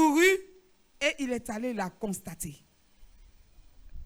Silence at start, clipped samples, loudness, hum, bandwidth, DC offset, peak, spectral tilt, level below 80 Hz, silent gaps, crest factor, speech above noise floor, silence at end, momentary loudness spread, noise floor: 0 s; under 0.1%; -29 LUFS; none; over 20 kHz; under 0.1%; -12 dBFS; -3.5 dB/octave; -56 dBFS; none; 18 dB; 25 dB; 0 s; 16 LU; -60 dBFS